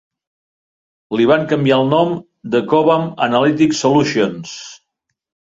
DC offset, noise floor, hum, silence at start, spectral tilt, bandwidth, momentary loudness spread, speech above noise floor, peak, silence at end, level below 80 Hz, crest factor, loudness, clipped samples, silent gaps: under 0.1%; -75 dBFS; none; 1.1 s; -5.5 dB/octave; 7.8 kHz; 14 LU; 61 dB; -2 dBFS; 0.75 s; -58 dBFS; 16 dB; -15 LUFS; under 0.1%; none